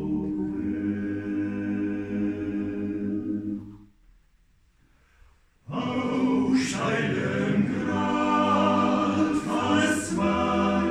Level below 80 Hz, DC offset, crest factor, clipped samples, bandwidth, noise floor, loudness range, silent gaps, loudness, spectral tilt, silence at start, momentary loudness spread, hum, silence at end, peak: -52 dBFS; under 0.1%; 16 dB; under 0.1%; 12.5 kHz; -62 dBFS; 10 LU; none; -26 LUFS; -5.5 dB/octave; 0 s; 8 LU; none; 0 s; -10 dBFS